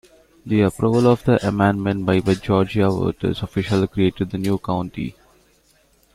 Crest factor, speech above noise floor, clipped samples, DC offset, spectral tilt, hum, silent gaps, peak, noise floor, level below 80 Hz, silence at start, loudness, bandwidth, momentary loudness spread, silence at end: 18 dB; 39 dB; under 0.1%; under 0.1%; -7.5 dB/octave; none; none; -2 dBFS; -58 dBFS; -46 dBFS; 0.45 s; -20 LUFS; 14 kHz; 8 LU; 1.05 s